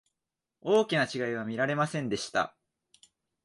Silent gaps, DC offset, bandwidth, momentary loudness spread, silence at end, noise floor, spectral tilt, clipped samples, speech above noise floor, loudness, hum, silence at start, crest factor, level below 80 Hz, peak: none; under 0.1%; 11.5 kHz; 7 LU; 0.95 s; -88 dBFS; -5 dB/octave; under 0.1%; 59 dB; -30 LUFS; none; 0.65 s; 18 dB; -70 dBFS; -14 dBFS